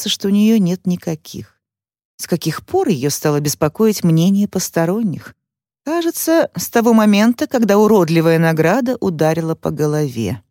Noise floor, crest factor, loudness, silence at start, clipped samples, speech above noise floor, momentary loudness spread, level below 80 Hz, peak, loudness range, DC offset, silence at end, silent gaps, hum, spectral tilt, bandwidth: -79 dBFS; 14 dB; -16 LUFS; 0 s; under 0.1%; 64 dB; 10 LU; -54 dBFS; -2 dBFS; 5 LU; under 0.1%; 0.1 s; 2.05-2.18 s; none; -5.5 dB/octave; 17 kHz